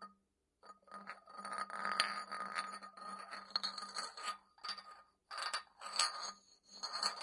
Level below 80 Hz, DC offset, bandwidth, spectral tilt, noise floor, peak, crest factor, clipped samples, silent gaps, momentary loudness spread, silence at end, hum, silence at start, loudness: -90 dBFS; under 0.1%; 11.5 kHz; 0.5 dB/octave; -81 dBFS; -14 dBFS; 30 dB; under 0.1%; none; 20 LU; 0 s; none; 0 s; -42 LUFS